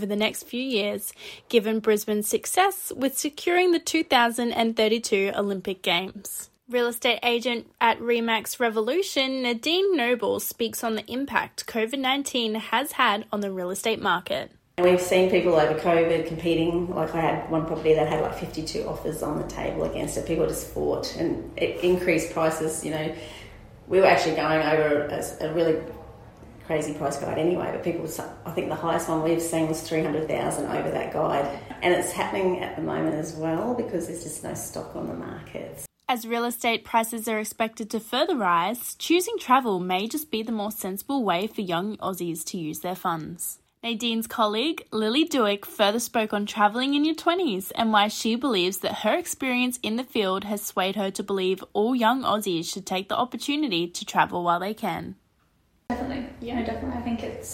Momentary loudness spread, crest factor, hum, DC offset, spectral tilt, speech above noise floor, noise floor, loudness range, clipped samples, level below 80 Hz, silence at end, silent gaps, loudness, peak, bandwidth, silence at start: 10 LU; 20 dB; none; under 0.1%; -4 dB/octave; 40 dB; -65 dBFS; 5 LU; under 0.1%; -52 dBFS; 0 s; none; -25 LUFS; -6 dBFS; 16.5 kHz; 0 s